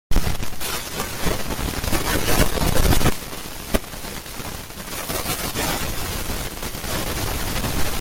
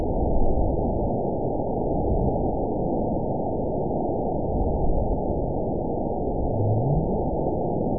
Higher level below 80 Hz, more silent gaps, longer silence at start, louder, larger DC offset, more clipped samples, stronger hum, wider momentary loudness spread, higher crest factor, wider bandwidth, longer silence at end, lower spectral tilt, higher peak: about the same, -28 dBFS vs -30 dBFS; neither; about the same, 0.1 s vs 0 s; about the same, -24 LUFS vs -26 LUFS; second, under 0.1% vs 2%; neither; neither; first, 12 LU vs 3 LU; about the same, 18 dB vs 14 dB; first, 17 kHz vs 1 kHz; about the same, 0 s vs 0 s; second, -3.5 dB/octave vs -19 dB/octave; first, -4 dBFS vs -10 dBFS